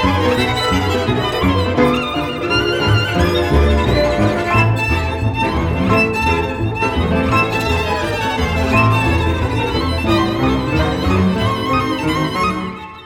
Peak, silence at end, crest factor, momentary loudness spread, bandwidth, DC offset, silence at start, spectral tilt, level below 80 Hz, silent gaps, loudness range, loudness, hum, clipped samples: 0 dBFS; 0 s; 14 dB; 4 LU; 17 kHz; under 0.1%; 0 s; -6 dB/octave; -26 dBFS; none; 1 LU; -16 LUFS; none; under 0.1%